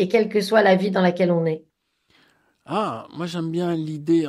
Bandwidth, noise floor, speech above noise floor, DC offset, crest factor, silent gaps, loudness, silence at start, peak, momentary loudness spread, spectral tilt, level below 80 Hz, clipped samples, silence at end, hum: 12.5 kHz; -65 dBFS; 44 dB; under 0.1%; 16 dB; none; -21 LUFS; 0 s; -4 dBFS; 11 LU; -6.5 dB/octave; -68 dBFS; under 0.1%; 0 s; none